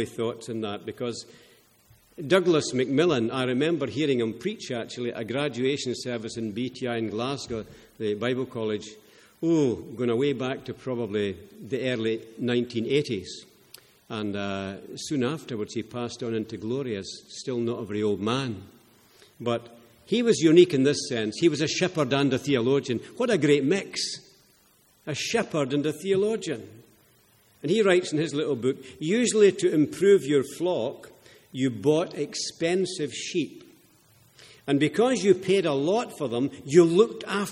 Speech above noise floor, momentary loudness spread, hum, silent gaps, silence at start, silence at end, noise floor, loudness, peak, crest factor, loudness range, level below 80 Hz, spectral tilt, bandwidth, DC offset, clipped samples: 36 dB; 12 LU; none; none; 0 s; 0 s; -61 dBFS; -26 LUFS; -4 dBFS; 22 dB; 8 LU; -66 dBFS; -5 dB/octave; 13 kHz; under 0.1%; under 0.1%